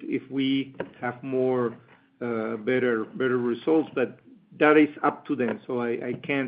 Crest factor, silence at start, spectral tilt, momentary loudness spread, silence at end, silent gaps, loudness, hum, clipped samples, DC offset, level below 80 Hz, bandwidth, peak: 18 dB; 0 s; -4.5 dB/octave; 12 LU; 0 s; none; -26 LUFS; none; under 0.1%; under 0.1%; -74 dBFS; 5 kHz; -8 dBFS